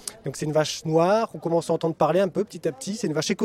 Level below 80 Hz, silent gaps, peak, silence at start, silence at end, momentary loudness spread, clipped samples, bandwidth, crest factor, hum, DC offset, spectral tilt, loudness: -62 dBFS; none; -6 dBFS; 0.05 s; 0 s; 8 LU; under 0.1%; 15.5 kHz; 18 dB; none; under 0.1%; -5 dB/octave; -24 LUFS